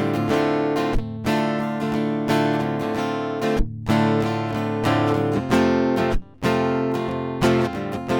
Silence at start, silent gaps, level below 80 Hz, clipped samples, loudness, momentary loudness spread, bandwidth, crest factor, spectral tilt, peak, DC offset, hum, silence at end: 0 s; none; -36 dBFS; under 0.1%; -22 LUFS; 6 LU; 18.5 kHz; 14 dB; -6.5 dB/octave; -6 dBFS; under 0.1%; none; 0 s